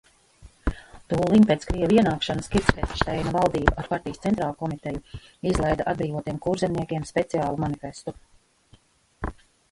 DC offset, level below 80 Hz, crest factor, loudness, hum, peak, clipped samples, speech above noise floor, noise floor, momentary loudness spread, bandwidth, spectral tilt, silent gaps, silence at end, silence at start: under 0.1%; -38 dBFS; 24 dB; -25 LUFS; none; 0 dBFS; under 0.1%; 34 dB; -58 dBFS; 17 LU; 11.5 kHz; -6.5 dB/octave; none; 0.4 s; 0.45 s